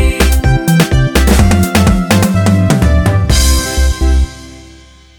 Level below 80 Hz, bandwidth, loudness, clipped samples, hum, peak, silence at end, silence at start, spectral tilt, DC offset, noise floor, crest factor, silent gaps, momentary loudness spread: -14 dBFS; 19.5 kHz; -11 LUFS; under 0.1%; none; 0 dBFS; 0.55 s; 0 s; -5 dB/octave; under 0.1%; -38 dBFS; 10 dB; none; 4 LU